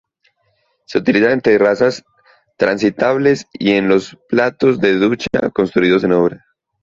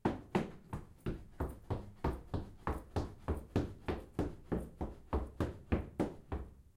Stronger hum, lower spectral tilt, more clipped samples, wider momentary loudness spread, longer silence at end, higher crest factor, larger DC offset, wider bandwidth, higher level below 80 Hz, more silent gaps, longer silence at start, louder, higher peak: neither; second, -6 dB/octave vs -8 dB/octave; neither; about the same, 6 LU vs 7 LU; first, 0.45 s vs 0.15 s; second, 14 dB vs 22 dB; neither; second, 7.6 kHz vs 15.5 kHz; about the same, -52 dBFS vs -48 dBFS; neither; first, 0.9 s vs 0.05 s; first, -15 LUFS vs -41 LUFS; first, -2 dBFS vs -18 dBFS